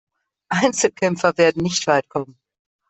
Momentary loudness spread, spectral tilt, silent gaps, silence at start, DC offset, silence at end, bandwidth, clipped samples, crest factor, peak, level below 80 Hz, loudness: 12 LU; -4 dB/octave; none; 0.5 s; under 0.1%; 0.6 s; 8.4 kHz; under 0.1%; 18 dB; -2 dBFS; -58 dBFS; -19 LUFS